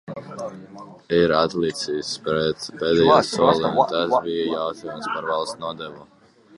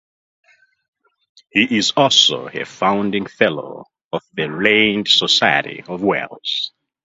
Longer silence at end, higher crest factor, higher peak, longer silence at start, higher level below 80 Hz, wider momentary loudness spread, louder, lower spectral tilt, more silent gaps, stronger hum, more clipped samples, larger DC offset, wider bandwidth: first, 0.55 s vs 0.35 s; about the same, 20 dB vs 18 dB; about the same, -2 dBFS vs 0 dBFS; second, 0.05 s vs 1.55 s; first, -54 dBFS vs -60 dBFS; about the same, 18 LU vs 16 LU; second, -21 LUFS vs -16 LUFS; first, -5 dB/octave vs -3 dB/octave; second, none vs 4.04-4.11 s; neither; neither; neither; first, 11.5 kHz vs 8 kHz